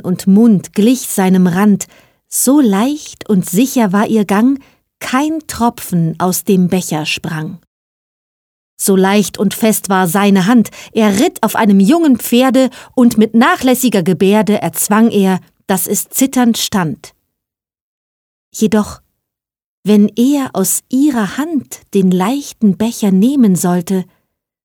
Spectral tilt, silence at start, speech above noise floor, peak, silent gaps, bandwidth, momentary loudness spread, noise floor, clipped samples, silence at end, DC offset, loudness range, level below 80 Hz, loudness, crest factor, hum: -5 dB/octave; 0.05 s; 71 dB; 0 dBFS; 7.67-8.77 s, 17.81-18.52 s, 19.64-19.83 s; 20 kHz; 8 LU; -82 dBFS; under 0.1%; 0.6 s; under 0.1%; 6 LU; -52 dBFS; -12 LUFS; 12 dB; none